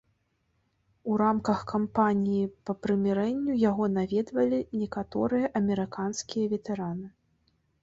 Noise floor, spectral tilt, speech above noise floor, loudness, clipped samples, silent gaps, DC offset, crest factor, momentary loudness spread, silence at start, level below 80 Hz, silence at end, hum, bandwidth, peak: -74 dBFS; -6.5 dB/octave; 46 dB; -28 LUFS; under 0.1%; none; under 0.1%; 18 dB; 8 LU; 1.05 s; -60 dBFS; 0.75 s; none; 7.8 kHz; -10 dBFS